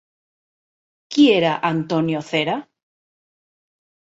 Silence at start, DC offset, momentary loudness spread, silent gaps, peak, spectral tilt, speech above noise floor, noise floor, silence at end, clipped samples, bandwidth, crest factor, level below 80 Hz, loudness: 1.1 s; under 0.1%; 10 LU; none; -4 dBFS; -6 dB/octave; over 71 dB; under -90 dBFS; 1.5 s; under 0.1%; 8 kHz; 18 dB; -66 dBFS; -19 LUFS